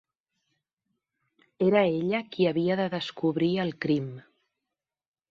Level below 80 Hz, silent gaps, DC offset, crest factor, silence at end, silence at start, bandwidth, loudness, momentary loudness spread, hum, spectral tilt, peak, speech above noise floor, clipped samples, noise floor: -70 dBFS; none; under 0.1%; 18 dB; 1.1 s; 1.6 s; 7.4 kHz; -27 LUFS; 6 LU; none; -8 dB/octave; -10 dBFS; 62 dB; under 0.1%; -88 dBFS